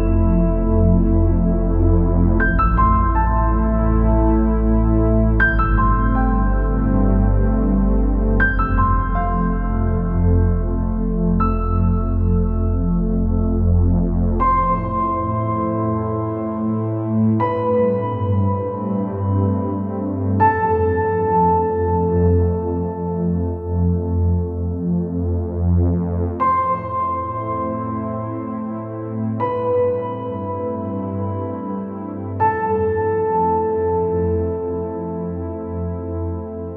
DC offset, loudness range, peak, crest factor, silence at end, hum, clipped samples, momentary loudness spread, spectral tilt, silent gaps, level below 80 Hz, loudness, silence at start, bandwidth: under 0.1%; 6 LU; -4 dBFS; 14 dB; 0 s; none; under 0.1%; 9 LU; -12.5 dB/octave; none; -22 dBFS; -19 LUFS; 0 s; 3.4 kHz